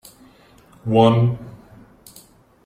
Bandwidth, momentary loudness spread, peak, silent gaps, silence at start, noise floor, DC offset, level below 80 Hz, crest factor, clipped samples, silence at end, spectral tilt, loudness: 14.5 kHz; 19 LU; -2 dBFS; none; 0.85 s; -50 dBFS; under 0.1%; -54 dBFS; 20 dB; under 0.1%; 1.15 s; -8 dB/octave; -17 LUFS